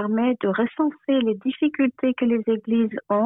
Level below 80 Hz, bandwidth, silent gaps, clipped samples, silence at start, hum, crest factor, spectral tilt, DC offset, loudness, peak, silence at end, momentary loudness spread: -66 dBFS; 3.9 kHz; none; under 0.1%; 0 s; none; 12 dB; -10.5 dB/octave; under 0.1%; -23 LUFS; -10 dBFS; 0 s; 2 LU